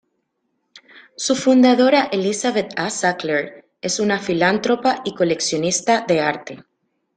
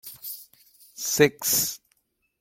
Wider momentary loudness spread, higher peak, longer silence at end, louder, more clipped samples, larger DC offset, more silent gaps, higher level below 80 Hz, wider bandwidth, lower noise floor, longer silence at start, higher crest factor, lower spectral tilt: second, 10 LU vs 18 LU; about the same, -2 dBFS vs -4 dBFS; about the same, 0.55 s vs 0.65 s; first, -18 LUFS vs -23 LUFS; neither; neither; neither; about the same, -62 dBFS vs -64 dBFS; second, 9.6 kHz vs 17 kHz; about the same, -72 dBFS vs -71 dBFS; first, 0.75 s vs 0.05 s; second, 16 dB vs 24 dB; about the same, -3.5 dB/octave vs -2.5 dB/octave